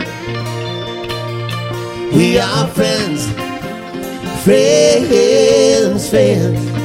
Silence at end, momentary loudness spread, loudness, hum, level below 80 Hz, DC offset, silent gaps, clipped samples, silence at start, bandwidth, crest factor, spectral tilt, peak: 0 s; 13 LU; -14 LUFS; none; -40 dBFS; under 0.1%; none; under 0.1%; 0 s; 16.5 kHz; 14 dB; -5 dB/octave; 0 dBFS